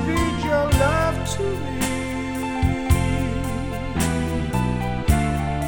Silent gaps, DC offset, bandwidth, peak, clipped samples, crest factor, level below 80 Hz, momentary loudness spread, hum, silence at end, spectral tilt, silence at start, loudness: none; under 0.1%; 18 kHz; -4 dBFS; under 0.1%; 16 dB; -28 dBFS; 7 LU; none; 0 s; -5.5 dB/octave; 0 s; -23 LUFS